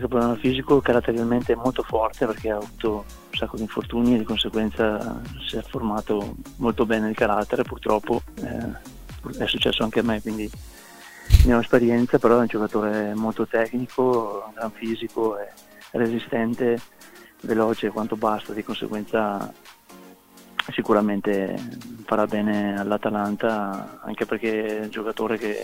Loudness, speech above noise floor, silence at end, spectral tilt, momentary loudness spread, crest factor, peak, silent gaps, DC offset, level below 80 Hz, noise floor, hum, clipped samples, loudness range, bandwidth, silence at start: -24 LUFS; 25 dB; 0 s; -6.5 dB/octave; 13 LU; 24 dB; 0 dBFS; none; under 0.1%; -36 dBFS; -48 dBFS; none; under 0.1%; 5 LU; 16 kHz; 0 s